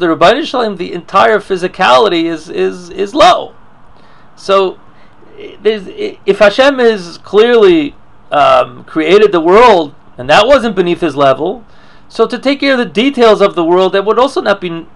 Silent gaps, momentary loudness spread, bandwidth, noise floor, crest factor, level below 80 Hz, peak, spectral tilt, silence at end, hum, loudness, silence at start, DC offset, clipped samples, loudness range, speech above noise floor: none; 11 LU; 11.5 kHz; -42 dBFS; 10 dB; -42 dBFS; 0 dBFS; -5 dB/octave; 0.1 s; none; -10 LUFS; 0 s; 1%; 1%; 5 LU; 32 dB